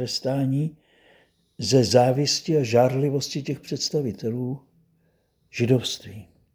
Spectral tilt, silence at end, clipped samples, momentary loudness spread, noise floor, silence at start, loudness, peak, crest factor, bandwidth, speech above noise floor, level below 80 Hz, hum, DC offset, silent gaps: -5.5 dB/octave; 0.3 s; under 0.1%; 13 LU; -67 dBFS; 0 s; -23 LUFS; -4 dBFS; 22 dB; over 20 kHz; 44 dB; -62 dBFS; none; under 0.1%; none